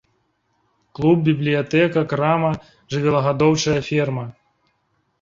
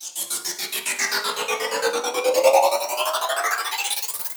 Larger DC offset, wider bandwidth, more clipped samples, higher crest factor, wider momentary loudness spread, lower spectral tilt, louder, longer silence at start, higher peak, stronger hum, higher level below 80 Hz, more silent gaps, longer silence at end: neither; second, 7.6 kHz vs over 20 kHz; neither; about the same, 18 dB vs 20 dB; about the same, 9 LU vs 8 LU; first, -6 dB/octave vs 1 dB/octave; first, -19 LUFS vs -22 LUFS; first, 1 s vs 0 s; about the same, -4 dBFS vs -4 dBFS; neither; first, -52 dBFS vs -76 dBFS; neither; first, 0.9 s vs 0 s